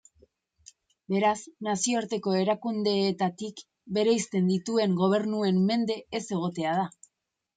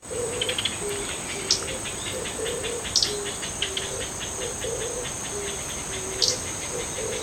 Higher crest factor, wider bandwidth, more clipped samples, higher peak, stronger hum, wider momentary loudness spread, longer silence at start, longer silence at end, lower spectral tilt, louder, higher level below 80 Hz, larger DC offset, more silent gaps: second, 14 dB vs 24 dB; second, 9.4 kHz vs 17.5 kHz; neither; second, -14 dBFS vs -6 dBFS; neither; about the same, 8 LU vs 7 LU; first, 1.1 s vs 0 s; first, 0.65 s vs 0 s; first, -5 dB/octave vs -1.5 dB/octave; about the same, -27 LUFS vs -27 LUFS; second, -72 dBFS vs -46 dBFS; neither; neither